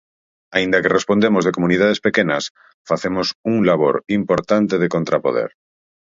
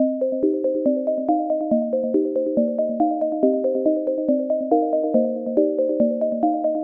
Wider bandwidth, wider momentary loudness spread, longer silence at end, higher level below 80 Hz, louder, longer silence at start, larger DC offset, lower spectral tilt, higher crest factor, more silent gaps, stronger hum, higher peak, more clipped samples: first, 7.8 kHz vs 1.7 kHz; first, 7 LU vs 2 LU; first, 0.55 s vs 0 s; first, -54 dBFS vs -66 dBFS; first, -18 LUFS vs -21 LUFS; first, 0.5 s vs 0 s; neither; second, -5.5 dB/octave vs -12 dB/octave; about the same, 18 dB vs 16 dB; first, 2.50-2.55 s, 2.74-2.85 s, 3.35-3.44 s vs none; neither; first, 0 dBFS vs -4 dBFS; neither